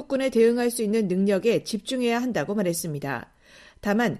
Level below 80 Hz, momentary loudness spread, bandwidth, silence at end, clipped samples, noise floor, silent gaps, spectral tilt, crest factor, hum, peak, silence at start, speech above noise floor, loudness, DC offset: -58 dBFS; 10 LU; 14.5 kHz; 0 s; under 0.1%; -52 dBFS; none; -5 dB/octave; 16 dB; none; -10 dBFS; 0 s; 29 dB; -24 LUFS; under 0.1%